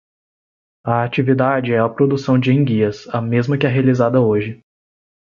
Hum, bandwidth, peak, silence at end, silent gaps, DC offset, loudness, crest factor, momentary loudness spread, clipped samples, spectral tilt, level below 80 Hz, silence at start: none; 7.2 kHz; -2 dBFS; 0.8 s; none; under 0.1%; -17 LUFS; 14 dB; 6 LU; under 0.1%; -8.5 dB/octave; -54 dBFS; 0.85 s